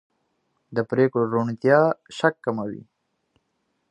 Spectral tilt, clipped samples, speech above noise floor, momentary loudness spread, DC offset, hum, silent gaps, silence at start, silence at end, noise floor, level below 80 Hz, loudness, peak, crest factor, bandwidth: -7.5 dB/octave; under 0.1%; 52 dB; 12 LU; under 0.1%; none; none; 0.7 s; 1.1 s; -73 dBFS; -68 dBFS; -22 LUFS; -2 dBFS; 22 dB; 10.5 kHz